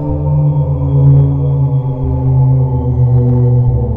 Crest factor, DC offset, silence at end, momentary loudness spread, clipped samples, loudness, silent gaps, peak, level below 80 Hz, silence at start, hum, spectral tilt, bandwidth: 10 dB; under 0.1%; 0 s; 5 LU; under 0.1%; -12 LUFS; none; 0 dBFS; -24 dBFS; 0 s; none; -13.5 dB/octave; 1.4 kHz